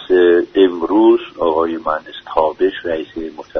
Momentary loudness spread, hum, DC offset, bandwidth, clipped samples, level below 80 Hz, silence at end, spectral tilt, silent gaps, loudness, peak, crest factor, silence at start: 11 LU; none; under 0.1%; 5.6 kHz; under 0.1%; -48 dBFS; 0 s; -7 dB/octave; none; -15 LUFS; 0 dBFS; 14 dB; 0 s